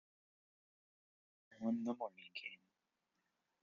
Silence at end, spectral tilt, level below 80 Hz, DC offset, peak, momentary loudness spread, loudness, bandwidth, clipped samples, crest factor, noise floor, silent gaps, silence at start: 1.05 s; -4 dB/octave; under -90 dBFS; under 0.1%; -30 dBFS; 11 LU; -45 LUFS; 7 kHz; under 0.1%; 20 dB; -88 dBFS; none; 1.5 s